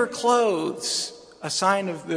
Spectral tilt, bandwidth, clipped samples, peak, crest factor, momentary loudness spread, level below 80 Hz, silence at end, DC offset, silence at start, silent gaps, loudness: -3 dB/octave; 10.5 kHz; under 0.1%; -6 dBFS; 18 dB; 9 LU; -70 dBFS; 0 s; under 0.1%; 0 s; none; -23 LUFS